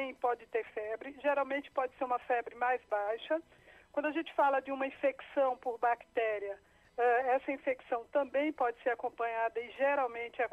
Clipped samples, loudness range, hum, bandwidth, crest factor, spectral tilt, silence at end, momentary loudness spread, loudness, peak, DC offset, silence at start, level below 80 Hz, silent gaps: under 0.1%; 2 LU; none; 8.4 kHz; 16 dB; -5 dB/octave; 0.05 s; 7 LU; -34 LUFS; -18 dBFS; under 0.1%; 0 s; -74 dBFS; none